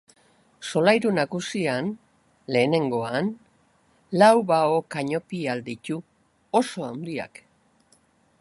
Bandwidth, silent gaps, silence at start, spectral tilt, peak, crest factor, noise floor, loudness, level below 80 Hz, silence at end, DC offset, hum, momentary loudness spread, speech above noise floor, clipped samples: 11.5 kHz; none; 0.6 s; -5.5 dB/octave; -4 dBFS; 22 dB; -62 dBFS; -24 LUFS; -68 dBFS; 1.15 s; under 0.1%; none; 15 LU; 39 dB; under 0.1%